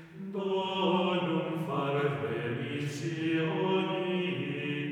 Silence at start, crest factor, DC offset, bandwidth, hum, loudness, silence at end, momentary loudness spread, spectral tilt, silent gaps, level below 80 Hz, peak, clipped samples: 0 s; 16 dB; under 0.1%; 13.5 kHz; none; -31 LUFS; 0 s; 6 LU; -6.5 dB/octave; none; -76 dBFS; -16 dBFS; under 0.1%